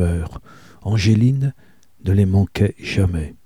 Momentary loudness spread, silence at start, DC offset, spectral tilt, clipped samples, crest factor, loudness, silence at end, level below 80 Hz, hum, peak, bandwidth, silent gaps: 12 LU; 0 s; 0.4%; -7.5 dB/octave; under 0.1%; 16 dB; -19 LUFS; 0.1 s; -34 dBFS; none; -2 dBFS; 11.5 kHz; none